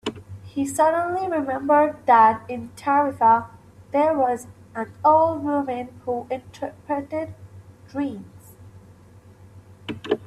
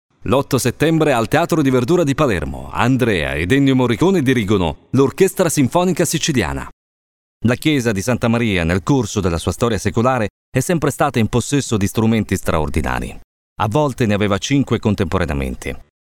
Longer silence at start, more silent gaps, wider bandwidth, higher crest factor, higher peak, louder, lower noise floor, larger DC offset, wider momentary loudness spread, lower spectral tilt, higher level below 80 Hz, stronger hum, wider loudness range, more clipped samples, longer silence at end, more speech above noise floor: second, 0.05 s vs 0.2 s; second, none vs 6.73-7.40 s, 10.30-10.52 s, 13.24-13.56 s; second, 13.5 kHz vs 18 kHz; about the same, 20 dB vs 16 dB; second, -4 dBFS vs 0 dBFS; second, -22 LUFS vs -17 LUFS; second, -48 dBFS vs under -90 dBFS; neither; first, 17 LU vs 7 LU; about the same, -5.5 dB/octave vs -5.5 dB/octave; second, -62 dBFS vs -36 dBFS; neither; first, 13 LU vs 3 LU; neither; second, 0 s vs 0.2 s; second, 27 dB vs over 74 dB